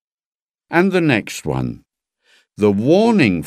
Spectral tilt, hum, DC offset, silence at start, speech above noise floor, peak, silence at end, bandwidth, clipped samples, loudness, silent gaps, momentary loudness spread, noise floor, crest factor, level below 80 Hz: -6.5 dB/octave; none; under 0.1%; 0.7 s; 45 dB; 0 dBFS; 0 s; 14.5 kHz; under 0.1%; -16 LUFS; none; 10 LU; -60 dBFS; 18 dB; -48 dBFS